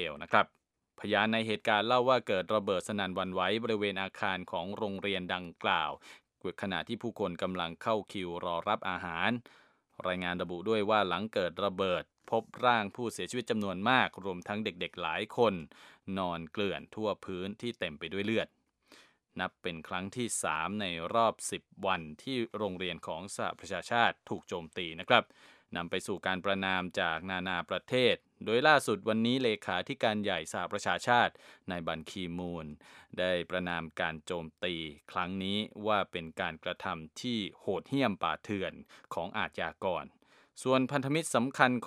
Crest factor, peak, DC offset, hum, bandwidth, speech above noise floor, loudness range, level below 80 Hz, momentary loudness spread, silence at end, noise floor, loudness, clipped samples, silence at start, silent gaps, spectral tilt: 28 dB; -6 dBFS; under 0.1%; none; 15 kHz; 29 dB; 6 LU; -68 dBFS; 11 LU; 0 s; -62 dBFS; -33 LUFS; under 0.1%; 0 s; none; -4.5 dB/octave